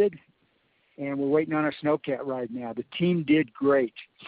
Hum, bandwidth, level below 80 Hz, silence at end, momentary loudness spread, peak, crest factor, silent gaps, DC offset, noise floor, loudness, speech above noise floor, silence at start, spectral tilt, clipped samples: none; 4.9 kHz; -70 dBFS; 0 s; 10 LU; -12 dBFS; 16 dB; none; under 0.1%; -69 dBFS; -27 LUFS; 43 dB; 0 s; -5.5 dB/octave; under 0.1%